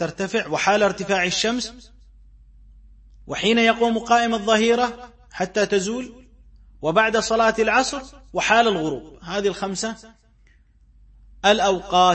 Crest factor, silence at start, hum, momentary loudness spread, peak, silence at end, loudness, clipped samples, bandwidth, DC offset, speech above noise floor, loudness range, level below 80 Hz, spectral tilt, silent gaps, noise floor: 20 dB; 0 s; none; 13 LU; -2 dBFS; 0 s; -20 LUFS; under 0.1%; 8.8 kHz; under 0.1%; 34 dB; 4 LU; -50 dBFS; -3.5 dB/octave; none; -55 dBFS